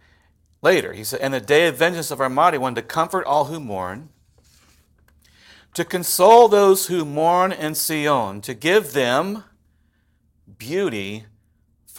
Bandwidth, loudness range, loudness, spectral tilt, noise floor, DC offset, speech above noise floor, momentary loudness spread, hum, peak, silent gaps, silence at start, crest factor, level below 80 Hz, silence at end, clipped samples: 17 kHz; 9 LU; -19 LUFS; -3.5 dB/octave; -63 dBFS; under 0.1%; 44 dB; 15 LU; none; 0 dBFS; none; 0.65 s; 20 dB; -60 dBFS; 0 s; under 0.1%